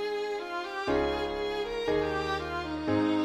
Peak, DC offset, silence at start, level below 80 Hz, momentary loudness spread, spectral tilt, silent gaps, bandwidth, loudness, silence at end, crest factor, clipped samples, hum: -16 dBFS; under 0.1%; 0 s; -48 dBFS; 5 LU; -5.5 dB/octave; none; 13.5 kHz; -31 LUFS; 0 s; 14 dB; under 0.1%; none